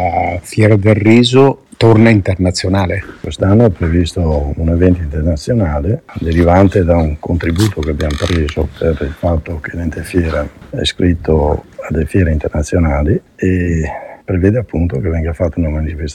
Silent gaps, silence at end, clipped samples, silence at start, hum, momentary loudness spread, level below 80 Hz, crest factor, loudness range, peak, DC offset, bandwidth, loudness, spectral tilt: none; 0 s; under 0.1%; 0 s; none; 10 LU; -24 dBFS; 12 dB; 6 LU; 0 dBFS; under 0.1%; 12.5 kHz; -14 LUFS; -7 dB/octave